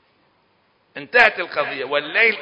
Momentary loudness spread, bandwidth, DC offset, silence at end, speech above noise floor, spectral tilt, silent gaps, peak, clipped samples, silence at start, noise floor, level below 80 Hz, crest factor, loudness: 17 LU; 8 kHz; under 0.1%; 0 s; 43 dB; -3.5 dB/octave; none; 0 dBFS; under 0.1%; 0.95 s; -62 dBFS; -60 dBFS; 20 dB; -17 LUFS